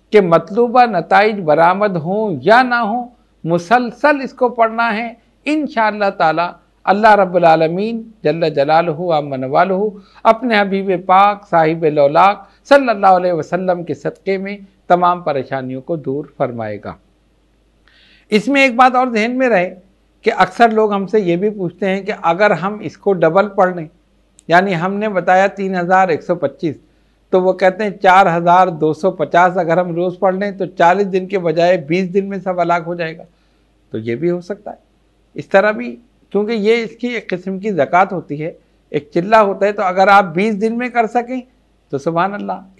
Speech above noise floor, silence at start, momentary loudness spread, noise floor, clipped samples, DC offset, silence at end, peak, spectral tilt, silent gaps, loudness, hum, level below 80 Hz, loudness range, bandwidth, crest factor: 41 dB; 0.1 s; 12 LU; -55 dBFS; under 0.1%; under 0.1%; 0.15 s; 0 dBFS; -6.5 dB/octave; none; -15 LUFS; none; -56 dBFS; 6 LU; 11.5 kHz; 14 dB